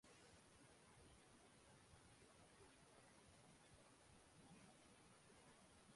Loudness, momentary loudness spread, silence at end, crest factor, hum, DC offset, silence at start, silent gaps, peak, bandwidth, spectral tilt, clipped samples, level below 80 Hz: -69 LUFS; 2 LU; 0 s; 14 dB; none; under 0.1%; 0.05 s; none; -54 dBFS; 11.5 kHz; -3.5 dB/octave; under 0.1%; -82 dBFS